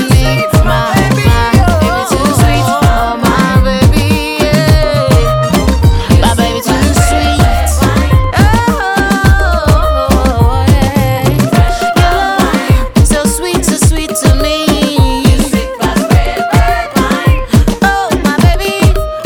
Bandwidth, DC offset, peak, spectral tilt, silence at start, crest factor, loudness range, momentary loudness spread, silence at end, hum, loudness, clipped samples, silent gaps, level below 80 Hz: 19 kHz; under 0.1%; 0 dBFS; -5.5 dB/octave; 0 s; 8 dB; 1 LU; 3 LU; 0 s; none; -10 LUFS; under 0.1%; none; -14 dBFS